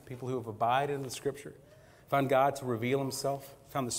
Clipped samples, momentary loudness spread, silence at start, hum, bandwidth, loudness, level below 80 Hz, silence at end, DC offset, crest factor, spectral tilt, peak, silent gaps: under 0.1%; 11 LU; 0.05 s; none; 16 kHz; -32 LUFS; -66 dBFS; 0 s; under 0.1%; 18 dB; -5 dB/octave; -14 dBFS; none